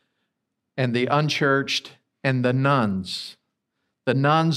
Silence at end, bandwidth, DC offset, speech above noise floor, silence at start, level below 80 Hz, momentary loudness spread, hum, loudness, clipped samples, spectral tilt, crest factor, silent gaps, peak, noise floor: 0 s; 13 kHz; under 0.1%; 58 dB; 0.75 s; -70 dBFS; 11 LU; none; -23 LUFS; under 0.1%; -6 dB/octave; 18 dB; none; -6 dBFS; -79 dBFS